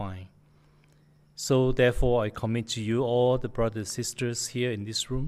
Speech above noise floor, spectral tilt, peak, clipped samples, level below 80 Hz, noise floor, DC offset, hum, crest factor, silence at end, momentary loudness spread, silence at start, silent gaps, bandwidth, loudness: 34 dB; -5 dB/octave; -12 dBFS; under 0.1%; -40 dBFS; -60 dBFS; under 0.1%; none; 16 dB; 0 s; 8 LU; 0 s; none; 15 kHz; -27 LUFS